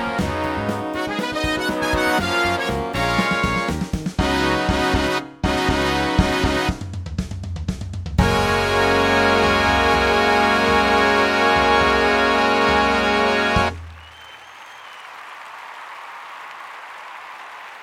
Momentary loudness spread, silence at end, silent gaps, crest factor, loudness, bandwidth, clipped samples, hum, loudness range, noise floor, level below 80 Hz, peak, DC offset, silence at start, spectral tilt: 20 LU; 0 s; none; 18 dB; -18 LUFS; 17.5 kHz; under 0.1%; none; 10 LU; -41 dBFS; -34 dBFS; -2 dBFS; under 0.1%; 0 s; -4.5 dB/octave